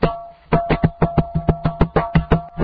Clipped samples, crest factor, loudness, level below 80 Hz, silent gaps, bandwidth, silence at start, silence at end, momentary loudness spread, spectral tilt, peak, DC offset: under 0.1%; 18 dB; -19 LUFS; -28 dBFS; none; 5 kHz; 0 s; 0 s; 4 LU; -10.5 dB/octave; 0 dBFS; under 0.1%